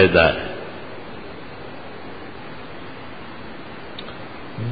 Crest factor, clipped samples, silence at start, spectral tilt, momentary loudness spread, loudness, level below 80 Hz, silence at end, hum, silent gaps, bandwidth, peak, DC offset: 22 dB; under 0.1%; 0 s; -10 dB/octave; 16 LU; -27 LUFS; -44 dBFS; 0 s; none; none; 5 kHz; -2 dBFS; 1%